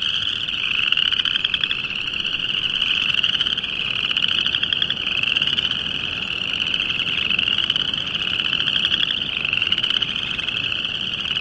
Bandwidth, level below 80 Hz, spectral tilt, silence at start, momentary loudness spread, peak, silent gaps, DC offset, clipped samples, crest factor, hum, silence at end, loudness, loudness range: 11 kHz; -50 dBFS; -2 dB/octave; 0 s; 5 LU; -2 dBFS; none; under 0.1%; under 0.1%; 20 dB; none; 0 s; -19 LUFS; 1 LU